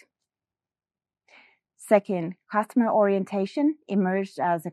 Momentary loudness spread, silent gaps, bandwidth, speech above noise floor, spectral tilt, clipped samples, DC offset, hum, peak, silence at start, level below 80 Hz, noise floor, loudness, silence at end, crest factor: 7 LU; none; 13 kHz; over 66 dB; -7.5 dB/octave; under 0.1%; under 0.1%; none; -6 dBFS; 1.8 s; -84 dBFS; under -90 dBFS; -25 LUFS; 0 s; 22 dB